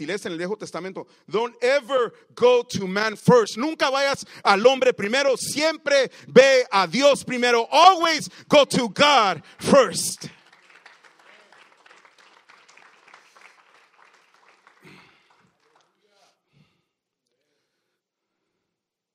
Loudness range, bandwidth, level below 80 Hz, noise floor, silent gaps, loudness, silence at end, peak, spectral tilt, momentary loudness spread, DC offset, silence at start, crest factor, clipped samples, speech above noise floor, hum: 6 LU; 16 kHz; -68 dBFS; -83 dBFS; none; -19 LUFS; 8.85 s; 0 dBFS; -3.5 dB/octave; 14 LU; under 0.1%; 0 s; 22 dB; under 0.1%; 63 dB; none